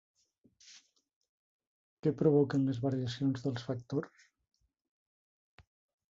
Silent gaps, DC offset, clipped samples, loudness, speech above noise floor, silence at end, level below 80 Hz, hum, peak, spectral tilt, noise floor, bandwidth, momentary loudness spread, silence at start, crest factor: 1.16-1.21 s, 1.29-1.59 s, 1.67-2.03 s; under 0.1%; under 0.1%; -33 LUFS; 37 dB; 2.05 s; -72 dBFS; none; -16 dBFS; -8 dB/octave; -69 dBFS; 7.6 kHz; 11 LU; 0.7 s; 20 dB